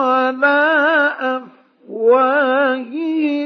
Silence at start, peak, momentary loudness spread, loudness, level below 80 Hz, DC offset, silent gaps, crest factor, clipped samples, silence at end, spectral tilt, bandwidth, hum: 0 s; -2 dBFS; 9 LU; -15 LUFS; -84 dBFS; under 0.1%; none; 14 dB; under 0.1%; 0 s; -5 dB/octave; 6.2 kHz; none